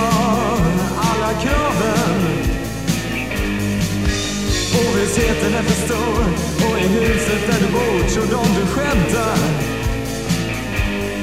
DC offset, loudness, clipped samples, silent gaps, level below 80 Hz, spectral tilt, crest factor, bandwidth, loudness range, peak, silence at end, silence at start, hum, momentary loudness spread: 0.9%; -18 LUFS; under 0.1%; none; -28 dBFS; -5 dB/octave; 16 dB; 16 kHz; 2 LU; -2 dBFS; 0 s; 0 s; none; 5 LU